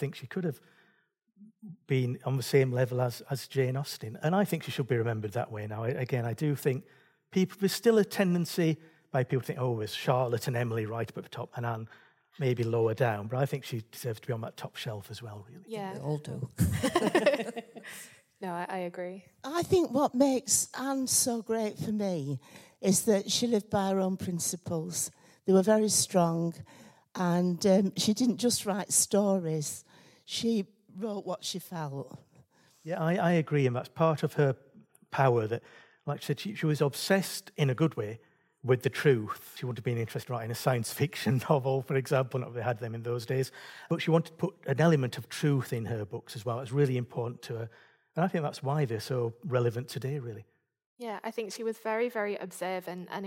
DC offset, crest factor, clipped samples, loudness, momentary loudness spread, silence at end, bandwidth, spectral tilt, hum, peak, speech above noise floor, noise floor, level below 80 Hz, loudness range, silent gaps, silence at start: under 0.1%; 20 dB; under 0.1%; -30 LUFS; 13 LU; 0 s; 16.5 kHz; -5 dB/octave; none; -10 dBFS; 41 dB; -71 dBFS; -64 dBFS; 5 LU; 50.86-50.97 s; 0 s